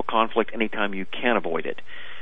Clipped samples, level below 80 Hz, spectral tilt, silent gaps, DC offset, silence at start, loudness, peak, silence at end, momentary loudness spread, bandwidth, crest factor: under 0.1%; -62 dBFS; -7 dB/octave; none; 4%; 0.1 s; -25 LUFS; -6 dBFS; 0 s; 12 LU; 5.2 kHz; 20 dB